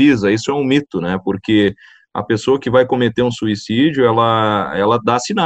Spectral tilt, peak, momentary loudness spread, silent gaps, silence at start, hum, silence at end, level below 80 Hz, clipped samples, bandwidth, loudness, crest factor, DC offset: -6 dB/octave; 0 dBFS; 7 LU; none; 0 s; none; 0 s; -50 dBFS; under 0.1%; 8.6 kHz; -15 LUFS; 14 dB; under 0.1%